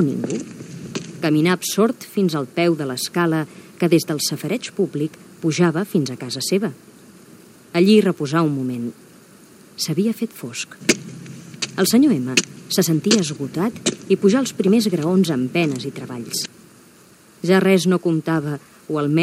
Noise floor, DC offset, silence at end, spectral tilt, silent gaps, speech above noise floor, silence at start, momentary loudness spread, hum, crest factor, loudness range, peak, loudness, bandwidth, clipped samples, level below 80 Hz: -49 dBFS; under 0.1%; 0 s; -5 dB/octave; none; 30 dB; 0 s; 13 LU; none; 20 dB; 4 LU; 0 dBFS; -20 LUFS; 16 kHz; under 0.1%; -66 dBFS